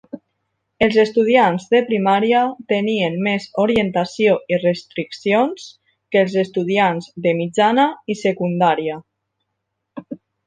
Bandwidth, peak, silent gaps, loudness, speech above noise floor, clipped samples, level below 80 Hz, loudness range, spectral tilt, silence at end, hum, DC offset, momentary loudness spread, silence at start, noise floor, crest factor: 9.4 kHz; -2 dBFS; none; -18 LUFS; 59 dB; under 0.1%; -56 dBFS; 3 LU; -6 dB/octave; 0.3 s; none; under 0.1%; 12 LU; 0.15 s; -76 dBFS; 16 dB